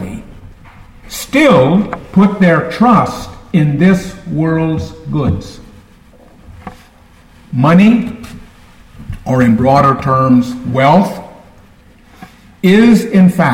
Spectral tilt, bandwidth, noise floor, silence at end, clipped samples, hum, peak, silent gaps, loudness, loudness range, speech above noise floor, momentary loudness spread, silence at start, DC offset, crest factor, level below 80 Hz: -7.5 dB/octave; 16 kHz; -43 dBFS; 0 s; under 0.1%; none; 0 dBFS; none; -11 LUFS; 6 LU; 33 dB; 19 LU; 0 s; under 0.1%; 12 dB; -38 dBFS